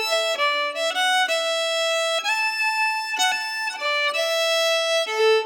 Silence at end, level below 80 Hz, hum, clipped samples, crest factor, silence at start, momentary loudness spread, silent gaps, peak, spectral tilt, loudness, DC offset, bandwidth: 0 s; under -90 dBFS; none; under 0.1%; 12 dB; 0 s; 3 LU; none; -10 dBFS; 3.5 dB/octave; -21 LUFS; under 0.1%; over 20 kHz